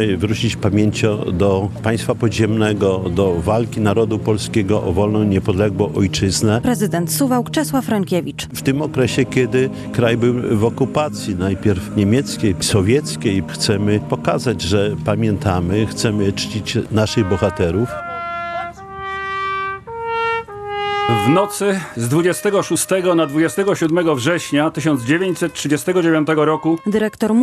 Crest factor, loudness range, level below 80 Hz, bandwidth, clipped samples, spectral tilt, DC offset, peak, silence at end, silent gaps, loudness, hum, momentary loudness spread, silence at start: 16 dB; 3 LU; -46 dBFS; 13.5 kHz; under 0.1%; -5.5 dB/octave; under 0.1%; 0 dBFS; 0 s; none; -18 LUFS; none; 5 LU; 0 s